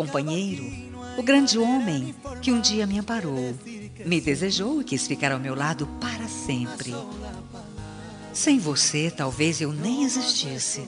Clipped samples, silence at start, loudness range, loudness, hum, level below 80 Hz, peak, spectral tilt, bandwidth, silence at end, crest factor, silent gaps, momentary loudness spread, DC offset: under 0.1%; 0 s; 5 LU; -25 LUFS; none; -52 dBFS; -8 dBFS; -3.5 dB/octave; 11 kHz; 0 s; 18 dB; none; 16 LU; under 0.1%